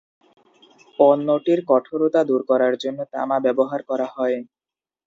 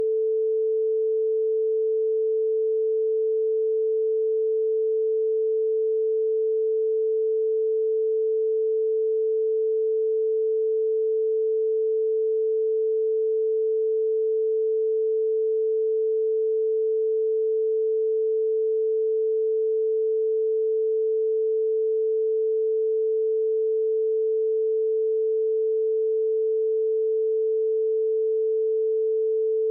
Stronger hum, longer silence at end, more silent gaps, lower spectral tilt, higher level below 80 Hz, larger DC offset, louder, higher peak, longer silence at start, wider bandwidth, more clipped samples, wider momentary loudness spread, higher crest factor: neither; first, 0.65 s vs 0 s; neither; first, -7 dB/octave vs 1.5 dB/octave; first, -72 dBFS vs under -90 dBFS; neither; first, -20 LUFS vs -24 LUFS; first, -2 dBFS vs -20 dBFS; first, 1 s vs 0 s; first, 7.6 kHz vs 0.6 kHz; neither; first, 10 LU vs 0 LU; first, 20 dB vs 4 dB